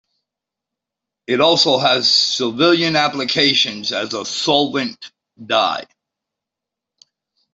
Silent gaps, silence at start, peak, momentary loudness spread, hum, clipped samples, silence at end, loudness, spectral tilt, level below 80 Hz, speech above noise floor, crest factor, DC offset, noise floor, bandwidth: none; 1.3 s; -2 dBFS; 10 LU; none; under 0.1%; 1.7 s; -15 LUFS; -3 dB/octave; -62 dBFS; 68 dB; 18 dB; under 0.1%; -84 dBFS; 8.2 kHz